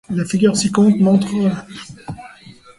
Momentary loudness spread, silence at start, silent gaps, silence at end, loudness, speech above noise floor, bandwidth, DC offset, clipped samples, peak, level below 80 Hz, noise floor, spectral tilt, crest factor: 20 LU; 0.1 s; none; 0.5 s; -15 LUFS; 26 dB; 11.5 kHz; under 0.1%; under 0.1%; -2 dBFS; -52 dBFS; -42 dBFS; -6 dB/octave; 14 dB